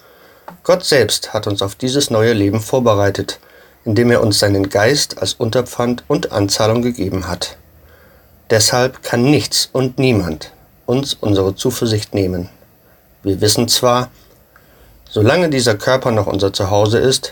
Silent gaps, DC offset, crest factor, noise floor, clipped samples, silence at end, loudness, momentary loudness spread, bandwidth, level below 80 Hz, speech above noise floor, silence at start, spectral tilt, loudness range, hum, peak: none; under 0.1%; 16 dB; -49 dBFS; under 0.1%; 0 s; -15 LUFS; 11 LU; 17.5 kHz; -44 dBFS; 35 dB; 0.5 s; -4.5 dB/octave; 3 LU; none; 0 dBFS